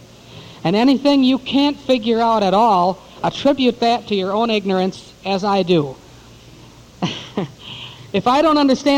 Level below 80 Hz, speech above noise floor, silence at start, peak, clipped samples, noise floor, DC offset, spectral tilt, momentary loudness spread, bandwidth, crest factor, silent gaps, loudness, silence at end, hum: -52 dBFS; 27 dB; 0.3 s; -4 dBFS; under 0.1%; -42 dBFS; under 0.1%; -6 dB/octave; 13 LU; 10.5 kHz; 14 dB; none; -17 LUFS; 0 s; none